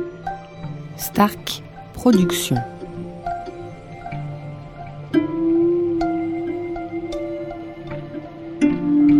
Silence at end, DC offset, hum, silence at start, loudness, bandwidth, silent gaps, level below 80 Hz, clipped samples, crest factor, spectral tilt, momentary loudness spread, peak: 0 s; under 0.1%; none; 0 s; -22 LUFS; 16.5 kHz; none; -46 dBFS; under 0.1%; 20 dB; -6 dB/octave; 16 LU; -2 dBFS